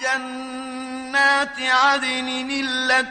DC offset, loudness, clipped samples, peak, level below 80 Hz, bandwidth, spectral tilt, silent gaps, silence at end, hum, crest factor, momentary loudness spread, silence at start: under 0.1%; -19 LUFS; under 0.1%; -4 dBFS; -60 dBFS; 9.8 kHz; -0.5 dB/octave; none; 0 s; none; 18 dB; 14 LU; 0 s